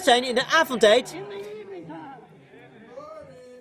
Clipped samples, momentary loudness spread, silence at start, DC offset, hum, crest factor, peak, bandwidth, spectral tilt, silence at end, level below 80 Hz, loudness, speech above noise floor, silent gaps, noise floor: under 0.1%; 25 LU; 0 s; under 0.1%; none; 20 dB; -4 dBFS; 16 kHz; -2.5 dB/octave; 0.05 s; -66 dBFS; -20 LUFS; 29 dB; none; -49 dBFS